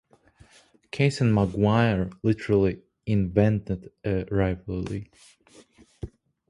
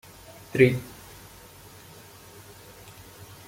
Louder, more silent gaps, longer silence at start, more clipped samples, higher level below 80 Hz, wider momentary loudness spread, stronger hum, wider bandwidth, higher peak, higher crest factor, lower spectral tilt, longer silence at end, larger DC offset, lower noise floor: about the same, -25 LUFS vs -23 LUFS; neither; first, 0.95 s vs 0.55 s; neither; first, -44 dBFS vs -58 dBFS; second, 16 LU vs 26 LU; neither; second, 11 kHz vs 16.5 kHz; about the same, -6 dBFS vs -4 dBFS; second, 20 dB vs 26 dB; first, -8 dB/octave vs -6.5 dB/octave; second, 0.4 s vs 2.6 s; neither; first, -58 dBFS vs -48 dBFS